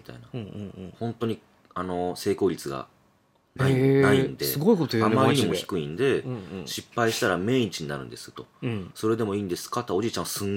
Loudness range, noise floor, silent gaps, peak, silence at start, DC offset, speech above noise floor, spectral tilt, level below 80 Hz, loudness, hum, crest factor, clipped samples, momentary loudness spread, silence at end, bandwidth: 7 LU; -64 dBFS; none; -6 dBFS; 0.1 s; under 0.1%; 39 dB; -5.5 dB/octave; -62 dBFS; -26 LUFS; none; 20 dB; under 0.1%; 17 LU; 0 s; 17.5 kHz